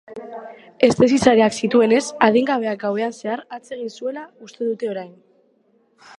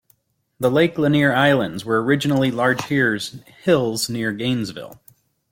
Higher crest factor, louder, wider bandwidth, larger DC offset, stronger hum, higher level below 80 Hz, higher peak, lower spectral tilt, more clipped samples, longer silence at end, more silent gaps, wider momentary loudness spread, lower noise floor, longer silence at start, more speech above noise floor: about the same, 20 dB vs 18 dB; about the same, -19 LUFS vs -19 LUFS; second, 11 kHz vs 16.5 kHz; neither; neither; about the same, -58 dBFS vs -56 dBFS; about the same, 0 dBFS vs -2 dBFS; about the same, -5 dB/octave vs -5.5 dB/octave; neither; first, 1.1 s vs 0.6 s; neither; first, 20 LU vs 10 LU; about the same, -60 dBFS vs -62 dBFS; second, 0.1 s vs 0.6 s; about the same, 42 dB vs 43 dB